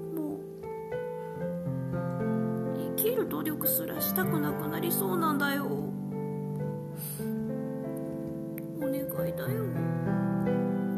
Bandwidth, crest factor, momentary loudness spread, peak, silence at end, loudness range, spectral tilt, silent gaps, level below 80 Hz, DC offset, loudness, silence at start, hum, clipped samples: 14.5 kHz; 18 dB; 9 LU; -14 dBFS; 0 s; 6 LU; -6 dB/octave; none; -62 dBFS; under 0.1%; -32 LUFS; 0 s; none; under 0.1%